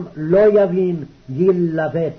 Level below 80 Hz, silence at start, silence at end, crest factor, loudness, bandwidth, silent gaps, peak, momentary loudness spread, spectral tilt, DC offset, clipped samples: -50 dBFS; 0 s; 0 s; 10 dB; -16 LUFS; 6.2 kHz; none; -6 dBFS; 11 LU; -10 dB/octave; under 0.1%; under 0.1%